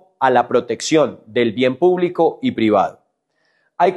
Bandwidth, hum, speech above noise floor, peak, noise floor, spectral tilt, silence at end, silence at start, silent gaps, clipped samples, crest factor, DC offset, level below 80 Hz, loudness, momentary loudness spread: 11.5 kHz; none; 50 dB; -2 dBFS; -66 dBFS; -5 dB/octave; 0 s; 0.2 s; none; under 0.1%; 16 dB; under 0.1%; -64 dBFS; -17 LUFS; 4 LU